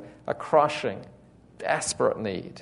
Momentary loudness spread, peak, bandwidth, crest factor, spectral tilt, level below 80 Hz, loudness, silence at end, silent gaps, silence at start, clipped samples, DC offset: 12 LU; -6 dBFS; 11 kHz; 22 dB; -3.5 dB/octave; -62 dBFS; -26 LUFS; 0 s; none; 0 s; under 0.1%; under 0.1%